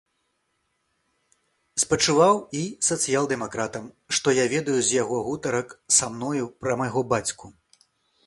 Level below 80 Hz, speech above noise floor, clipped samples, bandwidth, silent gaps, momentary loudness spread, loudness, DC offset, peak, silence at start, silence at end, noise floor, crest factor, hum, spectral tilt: -60 dBFS; 50 dB; under 0.1%; 11.5 kHz; none; 10 LU; -23 LUFS; under 0.1%; -4 dBFS; 1.75 s; 0.75 s; -74 dBFS; 22 dB; none; -3 dB/octave